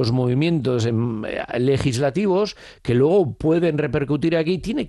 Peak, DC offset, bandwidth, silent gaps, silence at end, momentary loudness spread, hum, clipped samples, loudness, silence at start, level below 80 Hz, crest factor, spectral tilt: -8 dBFS; under 0.1%; 12 kHz; none; 0 s; 6 LU; none; under 0.1%; -20 LUFS; 0 s; -46 dBFS; 12 dB; -7 dB/octave